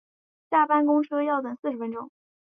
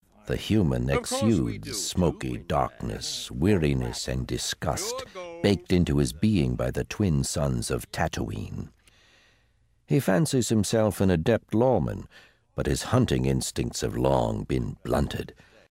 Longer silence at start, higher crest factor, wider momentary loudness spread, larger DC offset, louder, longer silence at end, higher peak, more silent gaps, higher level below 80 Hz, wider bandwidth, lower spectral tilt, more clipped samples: first, 0.5 s vs 0.25 s; about the same, 16 dB vs 20 dB; first, 14 LU vs 9 LU; neither; about the same, -25 LUFS vs -26 LUFS; about the same, 0.45 s vs 0.4 s; about the same, -10 dBFS vs -8 dBFS; first, 1.59-1.63 s vs none; second, -80 dBFS vs -40 dBFS; second, 3.7 kHz vs 16 kHz; first, -8 dB/octave vs -5.5 dB/octave; neither